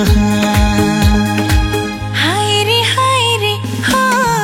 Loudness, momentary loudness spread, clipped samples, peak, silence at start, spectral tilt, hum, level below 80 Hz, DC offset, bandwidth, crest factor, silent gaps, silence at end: -13 LUFS; 5 LU; under 0.1%; 0 dBFS; 0 s; -4.5 dB/octave; none; -22 dBFS; under 0.1%; 16.5 kHz; 12 dB; none; 0 s